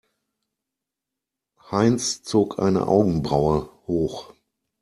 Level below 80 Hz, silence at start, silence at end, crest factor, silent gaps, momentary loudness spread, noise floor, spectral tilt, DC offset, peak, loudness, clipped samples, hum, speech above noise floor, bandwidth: -48 dBFS; 1.7 s; 0.55 s; 20 dB; none; 9 LU; -86 dBFS; -6 dB/octave; under 0.1%; -4 dBFS; -22 LUFS; under 0.1%; none; 64 dB; 13 kHz